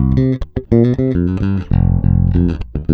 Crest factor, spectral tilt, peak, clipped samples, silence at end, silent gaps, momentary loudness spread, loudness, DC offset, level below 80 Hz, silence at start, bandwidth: 14 dB; -11 dB/octave; 0 dBFS; under 0.1%; 0 s; none; 5 LU; -15 LUFS; under 0.1%; -22 dBFS; 0 s; 5 kHz